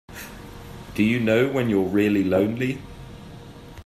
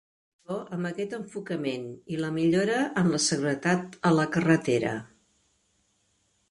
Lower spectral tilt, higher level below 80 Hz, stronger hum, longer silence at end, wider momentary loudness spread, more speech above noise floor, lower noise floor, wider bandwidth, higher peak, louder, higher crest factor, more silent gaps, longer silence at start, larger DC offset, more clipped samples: first, -7 dB/octave vs -5 dB/octave; first, -48 dBFS vs -66 dBFS; neither; second, 0.05 s vs 1.45 s; first, 21 LU vs 12 LU; second, 21 dB vs 44 dB; second, -41 dBFS vs -71 dBFS; first, 14.5 kHz vs 11.5 kHz; about the same, -8 dBFS vs -10 dBFS; first, -22 LUFS vs -27 LUFS; about the same, 16 dB vs 18 dB; neither; second, 0.1 s vs 0.5 s; neither; neither